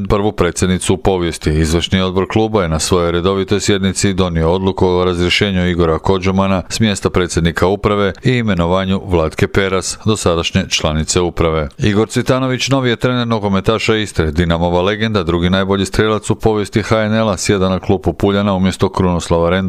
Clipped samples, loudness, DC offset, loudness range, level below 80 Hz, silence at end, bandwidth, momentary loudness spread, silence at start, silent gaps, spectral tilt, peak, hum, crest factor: under 0.1%; -15 LUFS; under 0.1%; 1 LU; -32 dBFS; 0 s; 14.5 kHz; 2 LU; 0 s; none; -5 dB/octave; 0 dBFS; none; 14 dB